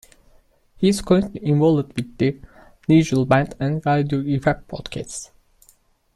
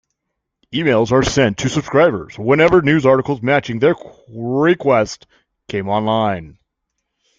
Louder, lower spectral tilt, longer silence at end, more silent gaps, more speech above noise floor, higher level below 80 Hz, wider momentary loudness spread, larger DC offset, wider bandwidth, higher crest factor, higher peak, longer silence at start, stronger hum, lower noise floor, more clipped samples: second, -20 LUFS vs -16 LUFS; about the same, -6.5 dB/octave vs -6 dB/octave; about the same, 0.9 s vs 0.9 s; neither; second, 38 dB vs 61 dB; about the same, -46 dBFS vs -44 dBFS; about the same, 14 LU vs 13 LU; neither; first, 13 kHz vs 7.8 kHz; about the same, 18 dB vs 16 dB; about the same, -4 dBFS vs -2 dBFS; about the same, 0.8 s vs 0.7 s; neither; second, -58 dBFS vs -77 dBFS; neither